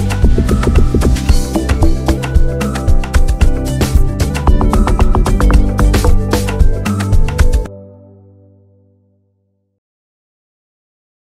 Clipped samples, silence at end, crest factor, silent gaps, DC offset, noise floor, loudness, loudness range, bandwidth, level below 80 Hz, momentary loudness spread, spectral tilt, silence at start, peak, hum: under 0.1%; 3.35 s; 12 dB; none; under 0.1%; -62 dBFS; -14 LUFS; 7 LU; 15 kHz; -12 dBFS; 4 LU; -6.5 dB/octave; 0 s; 0 dBFS; none